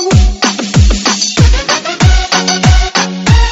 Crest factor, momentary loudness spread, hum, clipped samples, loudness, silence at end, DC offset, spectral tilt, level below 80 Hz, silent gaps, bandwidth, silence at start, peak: 8 dB; 3 LU; none; 0.7%; -10 LUFS; 0 s; under 0.1%; -4 dB/octave; -12 dBFS; none; 8 kHz; 0 s; 0 dBFS